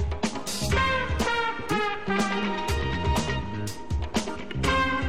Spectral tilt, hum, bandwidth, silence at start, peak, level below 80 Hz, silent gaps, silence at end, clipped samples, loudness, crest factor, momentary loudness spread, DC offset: -4.5 dB/octave; none; 16 kHz; 0 s; -12 dBFS; -34 dBFS; none; 0 s; under 0.1%; -27 LUFS; 16 dB; 7 LU; 1%